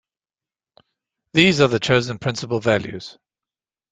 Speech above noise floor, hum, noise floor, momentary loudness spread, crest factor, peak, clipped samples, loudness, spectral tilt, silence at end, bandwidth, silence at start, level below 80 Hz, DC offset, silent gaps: over 71 dB; none; under -90 dBFS; 18 LU; 20 dB; -2 dBFS; under 0.1%; -19 LUFS; -5 dB/octave; 0.8 s; 9.4 kHz; 1.35 s; -54 dBFS; under 0.1%; none